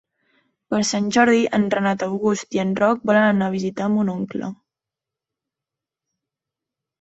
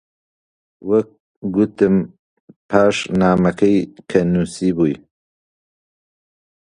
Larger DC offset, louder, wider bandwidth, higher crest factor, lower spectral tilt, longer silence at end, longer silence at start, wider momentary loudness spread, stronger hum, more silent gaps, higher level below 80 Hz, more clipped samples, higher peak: neither; second, -20 LUFS vs -17 LUFS; second, 8.2 kHz vs 10.5 kHz; about the same, 18 dB vs 20 dB; second, -5 dB/octave vs -7 dB/octave; first, 2.45 s vs 1.8 s; about the same, 0.7 s vs 0.8 s; second, 9 LU vs 14 LU; neither; second, none vs 1.20-1.42 s, 2.19-2.48 s, 2.56-2.69 s; second, -62 dBFS vs -48 dBFS; neither; second, -4 dBFS vs 0 dBFS